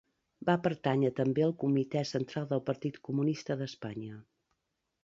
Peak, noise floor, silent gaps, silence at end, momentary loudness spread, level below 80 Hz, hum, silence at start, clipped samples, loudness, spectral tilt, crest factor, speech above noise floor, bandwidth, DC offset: -14 dBFS; -83 dBFS; none; 0.8 s; 12 LU; -72 dBFS; none; 0.4 s; under 0.1%; -32 LUFS; -7.5 dB/octave; 20 dB; 51 dB; 7.6 kHz; under 0.1%